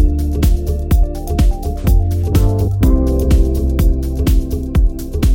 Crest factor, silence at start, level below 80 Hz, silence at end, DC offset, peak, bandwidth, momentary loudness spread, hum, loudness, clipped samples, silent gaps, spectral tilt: 12 dB; 0 s; -14 dBFS; 0 s; under 0.1%; 0 dBFS; 17 kHz; 4 LU; none; -16 LUFS; under 0.1%; none; -7.5 dB/octave